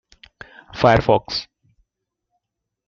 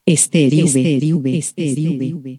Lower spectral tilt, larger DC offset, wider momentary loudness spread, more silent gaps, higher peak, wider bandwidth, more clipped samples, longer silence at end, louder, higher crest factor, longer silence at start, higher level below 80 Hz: about the same, -6 dB/octave vs -5 dB/octave; neither; first, 13 LU vs 7 LU; neither; about the same, -2 dBFS vs 0 dBFS; second, 7.2 kHz vs 13 kHz; neither; first, 1.45 s vs 0 s; about the same, -18 LUFS vs -16 LUFS; first, 22 dB vs 16 dB; first, 0.75 s vs 0.05 s; first, -44 dBFS vs -70 dBFS